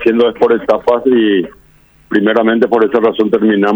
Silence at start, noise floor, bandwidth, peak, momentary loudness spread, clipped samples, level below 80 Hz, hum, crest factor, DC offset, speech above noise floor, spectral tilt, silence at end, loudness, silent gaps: 0 s; -47 dBFS; over 20 kHz; 0 dBFS; 4 LU; under 0.1%; -50 dBFS; none; 12 dB; under 0.1%; 36 dB; -7.5 dB/octave; 0 s; -12 LUFS; none